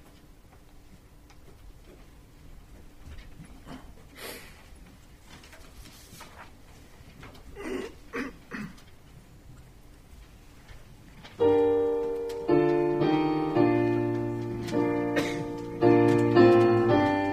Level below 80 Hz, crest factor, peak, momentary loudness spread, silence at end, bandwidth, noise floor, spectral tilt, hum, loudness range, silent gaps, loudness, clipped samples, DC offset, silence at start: -52 dBFS; 20 dB; -8 dBFS; 27 LU; 0 s; 14 kHz; -52 dBFS; -7.5 dB/octave; none; 23 LU; none; -25 LUFS; under 0.1%; under 0.1%; 0.95 s